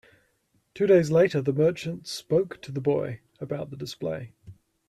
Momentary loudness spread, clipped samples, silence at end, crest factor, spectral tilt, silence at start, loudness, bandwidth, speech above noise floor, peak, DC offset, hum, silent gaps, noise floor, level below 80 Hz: 15 LU; under 0.1%; 0.35 s; 18 dB; -6.5 dB/octave; 0.75 s; -26 LUFS; 13.5 kHz; 45 dB; -8 dBFS; under 0.1%; none; none; -70 dBFS; -64 dBFS